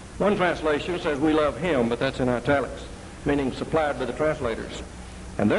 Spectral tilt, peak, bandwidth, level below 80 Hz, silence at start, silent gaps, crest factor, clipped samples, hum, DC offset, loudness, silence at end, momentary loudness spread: -6 dB/octave; -8 dBFS; 11.5 kHz; -42 dBFS; 0 s; none; 16 dB; under 0.1%; none; under 0.1%; -25 LUFS; 0 s; 13 LU